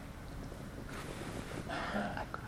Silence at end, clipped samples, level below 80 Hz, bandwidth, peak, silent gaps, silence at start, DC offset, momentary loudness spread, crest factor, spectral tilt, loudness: 0 s; under 0.1%; -52 dBFS; 17 kHz; -22 dBFS; none; 0 s; under 0.1%; 9 LU; 20 dB; -5.5 dB/octave; -42 LUFS